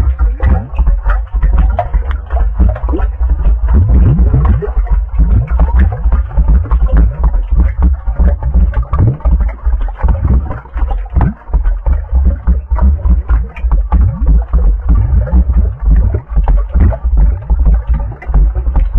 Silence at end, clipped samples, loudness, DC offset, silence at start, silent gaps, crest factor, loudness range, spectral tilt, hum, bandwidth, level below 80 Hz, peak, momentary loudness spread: 0 s; under 0.1%; -13 LUFS; under 0.1%; 0 s; none; 8 dB; 3 LU; -11.5 dB/octave; none; 2.9 kHz; -10 dBFS; -2 dBFS; 5 LU